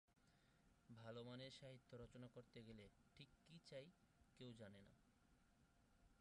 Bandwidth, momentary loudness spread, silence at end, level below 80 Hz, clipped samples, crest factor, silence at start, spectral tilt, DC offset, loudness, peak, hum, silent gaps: 11 kHz; 10 LU; 0 s; -82 dBFS; under 0.1%; 18 dB; 0.1 s; -5.5 dB/octave; under 0.1%; -62 LUFS; -46 dBFS; none; none